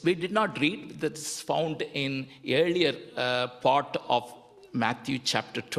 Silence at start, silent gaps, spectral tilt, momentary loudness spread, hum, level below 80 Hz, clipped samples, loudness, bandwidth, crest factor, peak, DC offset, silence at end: 0 s; none; -4 dB/octave; 8 LU; none; -68 dBFS; under 0.1%; -28 LUFS; 14.5 kHz; 22 dB; -6 dBFS; under 0.1%; 0 s